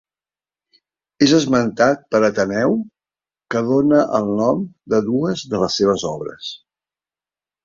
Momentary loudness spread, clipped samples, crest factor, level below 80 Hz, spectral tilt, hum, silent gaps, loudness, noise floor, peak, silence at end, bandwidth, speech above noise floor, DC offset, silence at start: 12 LU; under 0.1%; 18 dB; -56 dBFS; -5.5 dB/octave; none; none; -18 LUFS; under -90 dBFS; -2 dBFS; 1.1 s; 7.6 kHz; over 73 dB; under 0.1%; 1.2 s